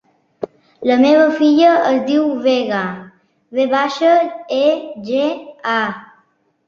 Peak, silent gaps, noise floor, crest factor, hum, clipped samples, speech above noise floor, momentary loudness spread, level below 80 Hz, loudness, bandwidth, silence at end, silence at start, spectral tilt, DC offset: -2 dBFS; none; -59 dBFS; 14 dB; none; under 0.1%; 45 dB; 16 LU; -64 dBFS; -15 LUFS; 7.2 kHz; 0.65 s; 0.4 s; -5.5 dB/octave; under 0.1%